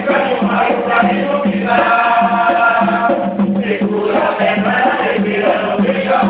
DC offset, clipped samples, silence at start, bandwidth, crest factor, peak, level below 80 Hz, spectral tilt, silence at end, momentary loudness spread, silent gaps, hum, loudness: under 0.1%; under 0.1%; 0 s; 4.9 kHz; 14 dB; 0 dBFS; -50 dBFS; -10.5 dB/octave; 0 s; 4 LU; none; none; -14 LUFS